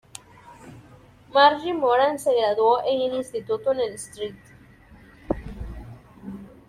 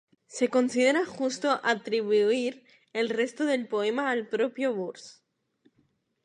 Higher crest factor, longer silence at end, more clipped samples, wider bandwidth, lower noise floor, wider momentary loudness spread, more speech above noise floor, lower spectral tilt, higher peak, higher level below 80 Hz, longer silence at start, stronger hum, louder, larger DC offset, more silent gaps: about the same, 22 dB vs 18 dB; second, 0.2 s vs 1.15 s; neither; first, 14.5 kHz vs 11 kHz; second, -50 dBFS vs -71 dBFS; first, 23 LU vs 10 LU; second, 29 dB vs 44 dB; about the same, -4 dB/octave vs -3.5 dB/octave; first, -4 dBFS vs -10 dBFS; first, -48 dBFS vs -82 dBFS; first, 0.45 s vs 0.3 s; neither; first, -22 LUFS vs -27 LUFS; neither; neither